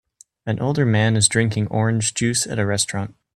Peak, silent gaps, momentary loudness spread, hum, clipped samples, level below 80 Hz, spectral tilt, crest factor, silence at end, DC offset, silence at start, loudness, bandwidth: -2 dBFS; none; 9 LU; none; under 0.1%; -52 dBFS; -4 dB/octave; 18 dB; 0.25 s; under 0.1%; 0.45 s; -20 LUFS; 13 kHz